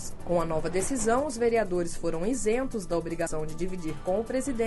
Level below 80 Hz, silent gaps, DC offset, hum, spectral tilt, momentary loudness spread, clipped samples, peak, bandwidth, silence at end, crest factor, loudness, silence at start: -40 dBFS; none; under 0.1%; none; -5 dB/octave; 7 LU; under 0.1%; -12 dBFS; 11.5 kHz; 0 s; 16 dB; -29 LUFS; 0 s